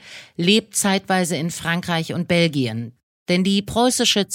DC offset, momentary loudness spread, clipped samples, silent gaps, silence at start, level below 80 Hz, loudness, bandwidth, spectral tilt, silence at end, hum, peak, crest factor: under 0.1%; 9 LU; under 0.1%; 3.03-3.26 s; 0.05 s; -54 dBFS; -19 LUFS; 17 kHz; -4 dB/octave; 0 s; none; -4 dBFS; 16 dB